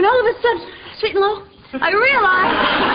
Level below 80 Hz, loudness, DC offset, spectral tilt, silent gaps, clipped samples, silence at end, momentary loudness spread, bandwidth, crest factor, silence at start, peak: -46 dBFS; -16 LUFS; under 0.1%; -9 dB/octave; none; under 0.1%; 0 s; 14 LU; 5.2 kHz; 12 dB; 0 s; -4 dBFS